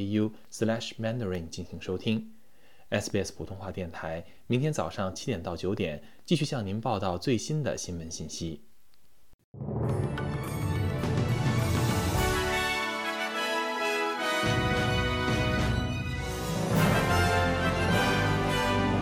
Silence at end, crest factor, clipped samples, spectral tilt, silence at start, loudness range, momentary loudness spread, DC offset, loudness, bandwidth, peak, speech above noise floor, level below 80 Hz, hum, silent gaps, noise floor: 0 s; 18 dB; under 0.1%; -5 dB/octave; 0 s; 7 LU; 11 LU; under 0.1%; -29 LUFS; 17.5 kHz; -12 dBFS; 35 dB; -44 dBFS; none; 9.34-9.54 s; -67 dBFS